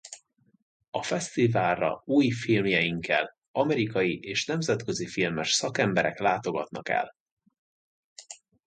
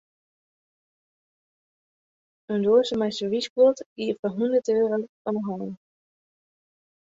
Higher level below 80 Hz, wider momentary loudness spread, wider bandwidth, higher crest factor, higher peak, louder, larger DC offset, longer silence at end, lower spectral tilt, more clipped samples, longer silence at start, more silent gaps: first, -62 dBFS vs -70 dBFS; about the same, 10 LU vs 10 LU; first, 9.6 kHz vs 7.8 kHz; about the same, 20 dB vs 18 dB; about the same, -8 dBFS vs -8 dBFS; second, -27 LUFS vs -24 LUFS; neither; second, 0.3 s vs 1.35 s; second, -4.5 dB/octave vs -6 dB/octave; neither; second, 0.05 s vs 2.5 s; first, 0.62-0.80 s, 0.88-0.92 s, 3.48-3.54 s, 7.20-7.26 s, 7.32-7.37 s, 7.58-8.16 s vs 3.50-3.56 s, 3.86-3.96 s, 4.19-4.23 s, 5.09-5.25 s